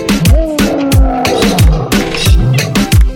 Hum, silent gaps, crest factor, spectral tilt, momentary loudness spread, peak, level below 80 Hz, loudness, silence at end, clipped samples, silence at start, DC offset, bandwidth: none; none; 8 dB; -5.5 dB/octave; 3 LU; 0 dBFS; -12 dBFS; -10 LUFS; 0 s; under 0.1%; 0 s; under 0.1%; 18 kHz